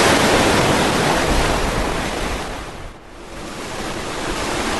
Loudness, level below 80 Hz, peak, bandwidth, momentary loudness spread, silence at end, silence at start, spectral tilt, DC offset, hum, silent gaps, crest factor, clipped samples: -18 LUFS; -30 dBFS; -2 dBFS; 12.5 kHz; 19 LU; 0 s; 0 s; -3.5 dB/octave; 1%; none; none; 18 dB; under 0.1%